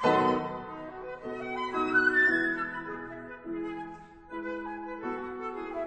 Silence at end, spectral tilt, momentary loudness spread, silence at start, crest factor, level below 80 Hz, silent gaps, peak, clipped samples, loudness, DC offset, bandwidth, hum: 0 s; -6 dB/octave; 17 LU; 0 s; 18 dB; -60 dBFS; none; -12 dBFS; under 0.1%; -30 LUFS; under 0.1%; 9 kHz; none